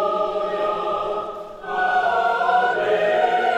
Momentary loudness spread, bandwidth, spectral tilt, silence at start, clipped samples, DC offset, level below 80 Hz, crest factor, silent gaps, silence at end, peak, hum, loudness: 9 LU; 9.4 kHz; -4.5 dB/octave; 0 s; under 0.1%; under 0.1%; -56 dBFS; 16 dB; none; 0 s; -6 dBFS; none; -21 LUFS